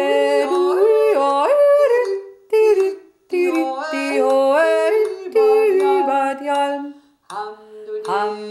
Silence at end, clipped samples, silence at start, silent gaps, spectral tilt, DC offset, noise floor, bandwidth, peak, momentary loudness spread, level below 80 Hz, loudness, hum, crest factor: 0 s; under 0.1%; 0 s; none; -3.5 dB/octave; under 0.1%; -37 dBFS; 14 kHz; -6 dBFS; 16 LU; -74 dBFS; -17 LUFS; none; 12 dB